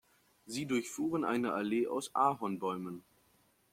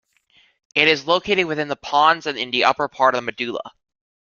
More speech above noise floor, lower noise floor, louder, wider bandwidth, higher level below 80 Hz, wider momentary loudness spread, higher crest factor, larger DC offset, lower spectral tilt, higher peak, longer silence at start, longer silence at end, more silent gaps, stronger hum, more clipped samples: about the same, 36 dB vs 39 dB; first, -71 dBFS vs -59 dBFS; second, -35 LUFS vs -19 LUFS; first, 16.5 kHz vs 7.2 kHz; second, -76 dBFS vs -60 dBFS; about the same, 11 LU vs 10 LU; about the same, 18 dB vs 20 dB; neither; first, -5 dB/octave vs -3.5 dB/octave; second, -16 dBFS vs -2 dBFS; second, 0.45 s vs 0.75 s; about the same, 0.75 s vs 0.7 s; neither; neither; neither